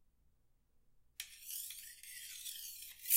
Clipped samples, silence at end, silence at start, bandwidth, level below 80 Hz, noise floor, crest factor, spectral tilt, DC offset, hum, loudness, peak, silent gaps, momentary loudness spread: under 0.1%; 0 s; 0.75 s; 16 kHz; -76 dBFS; -73 dBFS; 28 dB; 4 dB/octave; under 0.1%; none; -47 LUFS; -16 dBFS; none; 6 LU